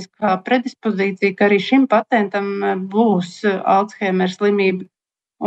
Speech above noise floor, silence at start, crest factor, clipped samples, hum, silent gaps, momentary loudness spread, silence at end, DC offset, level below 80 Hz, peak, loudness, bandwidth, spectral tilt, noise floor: 21 dB; 0 s; 14 dB; under 0.1%; none; none; 6 LU; 0 s; under 0.1%; -72 dBFS; -4 dBFS; -18 LUFS; 8.2 kHz; -6.5 dB/octave; -39 dBFS